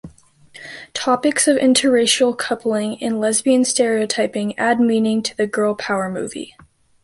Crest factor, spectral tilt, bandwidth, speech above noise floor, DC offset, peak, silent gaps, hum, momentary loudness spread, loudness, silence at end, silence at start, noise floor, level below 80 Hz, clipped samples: 16 dB; -3 dB/octave; 12 kHz; 29 dB; under 0.1%; -2 dBFS; none; none; 14 LU; -18 LUFS; 0.6 s; 0.05 s; -46 dBFS; -60 dBFS; under 0.1%